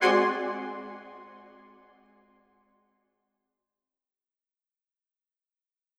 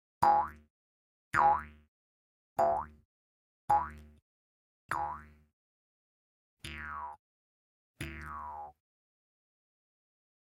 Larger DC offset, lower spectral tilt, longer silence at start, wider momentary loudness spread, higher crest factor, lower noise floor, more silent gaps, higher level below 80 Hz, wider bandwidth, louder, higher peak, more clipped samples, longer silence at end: neither; about the same, -4.5 dB/octave vs -5 dB/octave; second, 0 s vs 0.2 s; first, 26 LU vs 20 LU; about the same, 24 dB vs 24 dB; about the same, -90 dBFS vs under -90 dBFS; second, none vs 0.70-1.31 s, 1.88-2.56 s, 3.05-3.68 s, 4.22-4.89 s, 5.53-6.57 s, 7.19-7.94 s; second, -84 dBFS vs -58 dBFS; second, 12 kHz vs 15.5 kHz; first, -28 LUFS vs -33 LUFS; about the same, -10 dBFS vs -12 dBFS; neither; first, 4.6 s vs 1.8 s